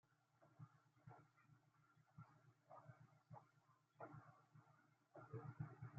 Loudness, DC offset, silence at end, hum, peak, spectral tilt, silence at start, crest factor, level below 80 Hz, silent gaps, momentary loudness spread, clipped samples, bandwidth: -63 LUFS; under 0.1%; 0 s; none; -40 dBFS; -8.5 dB/octave; 0.05 s; 22 dB; under -90 dBFS; none; 12 LU; under 0.1%; 7 kHz